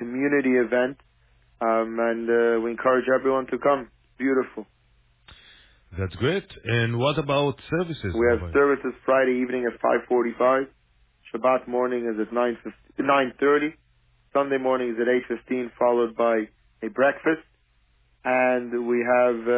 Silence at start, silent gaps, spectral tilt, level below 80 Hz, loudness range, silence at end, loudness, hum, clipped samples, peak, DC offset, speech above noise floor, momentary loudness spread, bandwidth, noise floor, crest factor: 0 s; none; -10 dB/octave; -50 dBFS; 4 LU; 0 s; -24 LUFS; none; under 0.1%; -8 dBFS; under 0.1%; 40 dB; 8 LU; 4 kHz; -63 dBFS; 16 dB